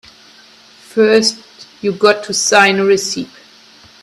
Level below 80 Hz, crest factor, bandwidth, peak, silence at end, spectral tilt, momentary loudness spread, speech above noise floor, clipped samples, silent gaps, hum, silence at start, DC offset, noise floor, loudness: -60 dBFS; 16 dB; 13.5 kHz; 0 dBFS; 0.75 s; -2.5 dB/octave; 13 LU; 31 dB; under 0.1%; none; none; 0.95 s; under 0.1%; -44 dBFS; -13 LUFS